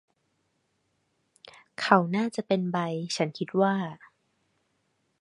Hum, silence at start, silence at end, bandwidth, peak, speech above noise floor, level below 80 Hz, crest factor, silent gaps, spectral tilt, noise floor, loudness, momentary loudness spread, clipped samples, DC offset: none; 1.45 s; 1.25 s; 11.5 kHz; -2 dBFS; 48 dB; -76 dBFS; 28 dB; none; -5.5 dB/octave; -74 dBFS; -27 LUFS; 10 LU; under 0.1%; under 0.1%